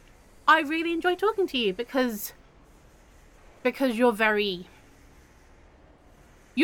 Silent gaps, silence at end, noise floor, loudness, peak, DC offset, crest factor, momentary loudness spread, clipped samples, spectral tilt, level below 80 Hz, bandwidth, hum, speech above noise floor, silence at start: none; 0 s; -55 dBFS; -25 LUFS; -6 dBFS; under 0.1%; 22 dB; 11 LU; under 0.1%; -4 dB/octave; -58 dBFS; 17.5 kHz; none; 29 dB; 0.45 s